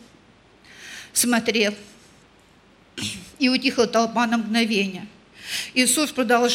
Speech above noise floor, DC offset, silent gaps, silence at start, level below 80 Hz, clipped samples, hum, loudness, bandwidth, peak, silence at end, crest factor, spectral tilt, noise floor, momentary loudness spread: 33 dB; under 0.1%; none; 0.8 s; -62 dBFS; under 0.1%; none; -21 LUFS; 17 kHz; -4 dBFS; 0 s; 18 dB; -2.5 dB/octave; -54 dBFS; 20 LU